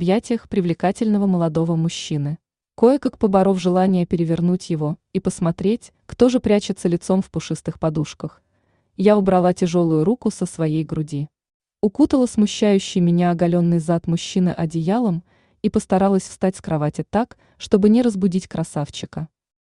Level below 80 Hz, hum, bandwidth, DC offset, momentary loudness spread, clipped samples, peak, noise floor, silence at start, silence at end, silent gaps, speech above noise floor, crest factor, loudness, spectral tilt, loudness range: -50 dBFS; none; 11 kHz; under 0.1%; 11 LU; under 0.1%; -2 dBFS; -65 dBFS; 0 s; 0.5 s; 11.54-11.60 s; 46 dB; 18 dB; -20 LUFS; -7 dB/octave; 2 LU